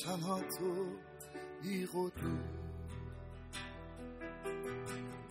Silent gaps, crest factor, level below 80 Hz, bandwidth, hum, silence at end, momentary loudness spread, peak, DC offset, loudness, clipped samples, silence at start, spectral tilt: none; 18 dB; -58 dBFS; 15.5 kHz; none; 0 s; 11 LU; -24 dBFS; under 0.1%; -43 LUFS; under 0.1%; 0 s; -5.5 dB/octave